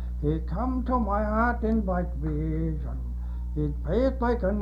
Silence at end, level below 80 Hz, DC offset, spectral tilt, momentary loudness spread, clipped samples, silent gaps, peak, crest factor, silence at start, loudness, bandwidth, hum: 0 s; -30 dBFS; under 0.1%; -10 dB/octave; 8 LU; under 0.1%; none; -12 dBFS; 14 dB; 0 s; -28 LUFS; 5.2 kHz; 60 Hz at -30 dBFS